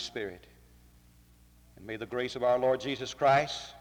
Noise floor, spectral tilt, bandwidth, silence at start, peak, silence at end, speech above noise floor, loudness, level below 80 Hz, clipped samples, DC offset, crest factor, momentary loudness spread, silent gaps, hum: -59 dBFS; -4.5 dB/octave; 19.5 kHz; 0 s; -14 dBFS; 0 s; 29 dB; -30 LUFS; -62 dBFS; under 0.1%; under 0.1%; 18 dB; 15 LU; none; 60 Hz at -65 dBFS